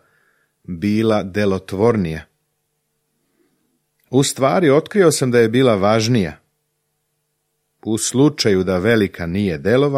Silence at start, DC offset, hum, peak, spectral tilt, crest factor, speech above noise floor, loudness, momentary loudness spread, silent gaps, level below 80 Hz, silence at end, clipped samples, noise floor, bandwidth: 0.7 s; under 0.1%; none; -2 dBFS; -5.5 dB/octave; 16 dB; 55 dB; -17 LUFS; 9 LU; none; -50 dBFS; 0 s; under 0.1%; -71 dBFS; 15.5 kHz